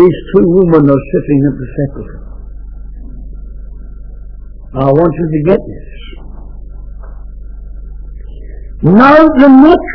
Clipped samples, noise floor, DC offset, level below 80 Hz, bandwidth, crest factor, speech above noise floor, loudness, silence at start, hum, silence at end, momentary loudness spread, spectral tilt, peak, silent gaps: 2%; -27 dBFS; under 0.1%; -26 dBFS; 5.4 kHz; 10 dB; 19 dB; -8 LUFS; 0 s; none; 0 s; 27 LU; -10 dB/octave; 0 dBFS; none